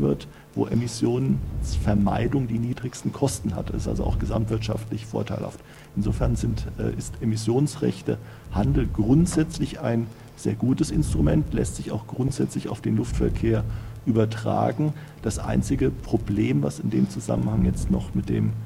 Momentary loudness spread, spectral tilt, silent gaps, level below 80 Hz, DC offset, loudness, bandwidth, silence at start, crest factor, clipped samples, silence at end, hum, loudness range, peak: 8 LU; -7 dB/octave; none; -34 dBFS; under 0.1%; -25 LUFS; 15.5 kHz; 0 s; 18 dB; under 0.1%; 0 s; none; 4 LU; -6 dBFS